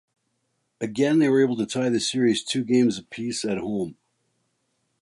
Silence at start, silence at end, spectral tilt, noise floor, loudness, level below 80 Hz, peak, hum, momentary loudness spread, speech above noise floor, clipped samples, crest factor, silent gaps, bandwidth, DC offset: 0.8 s; 1.1 s; -5 dB/octave; -74 dBFS; -23 LUFS; -66 dBFS; -8 dBFS; none; 11 LU; 51 dB; under 0.1%; 16 dB; none; 11.5 kHz; under 0.1%